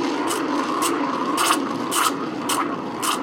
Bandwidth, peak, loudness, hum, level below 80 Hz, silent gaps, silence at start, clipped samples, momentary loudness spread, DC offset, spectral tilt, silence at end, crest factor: 17 kHz; -4 dBFS; -22 LUFS; none; -64 dBFS; none; 0 s; under 0.1%; 4 LU; under 0.1%; -2.5 dB/octave; 0 s; 20 dB